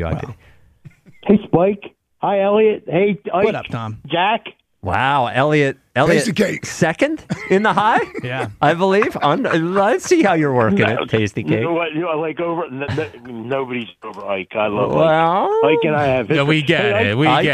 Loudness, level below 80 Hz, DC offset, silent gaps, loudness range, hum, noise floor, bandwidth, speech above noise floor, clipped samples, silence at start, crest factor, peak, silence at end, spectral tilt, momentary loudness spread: -17 LUFS; -48 dBFS; under 0.1%; none; 4 LU; none; -45 dBFS; 14 kHz; 29 dB; under 0.1%; 0 s; 14 dB; -2 dBFS; 0 s; -6 dB/octave; 10 LU